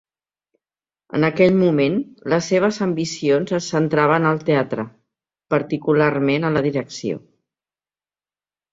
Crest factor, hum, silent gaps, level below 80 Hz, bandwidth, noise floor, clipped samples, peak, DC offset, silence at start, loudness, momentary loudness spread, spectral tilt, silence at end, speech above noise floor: 18 dB; none; none; -60 dBFS; 7.8 kHz; under -90 dBFS; under 0.1%; -2 dBFS; under 0.1%; 1.15 s; -19 LUFS; 11 LU; -6 dB/octave; 1.55 s; over 72 dB